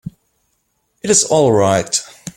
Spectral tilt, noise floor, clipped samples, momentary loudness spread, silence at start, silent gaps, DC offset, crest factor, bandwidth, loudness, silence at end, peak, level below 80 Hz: -3.5 dB/octave; -66 dBFS; under 0.1%; 14 LU; 0.05 s; none; under 0.1%; 16 dB; 16.5 kHz; -14 LUFS; 0.05 s; 0 dBFS; -52 dBFS